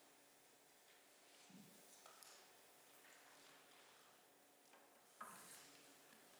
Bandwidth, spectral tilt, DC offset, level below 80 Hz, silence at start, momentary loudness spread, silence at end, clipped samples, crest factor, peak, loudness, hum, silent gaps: over 20 kHz; -1.5 dB/octave; under 0.1%; under -90 dBFS; 0 s; 9 LU; 0 s; under 0.1%; 24 dB; -42 dBFS; -64 LUFS; none; none